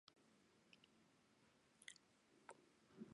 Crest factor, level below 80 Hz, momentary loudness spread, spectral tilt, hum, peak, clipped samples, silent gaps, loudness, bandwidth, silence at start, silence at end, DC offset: 30 dB; under -90 dBFS; 6 LU; -3 dB/octave; none; -38 dBFS; under 0.1%; none; -65 LUFS; 11 kHz; 0.05 s; 0 s; under 0.1%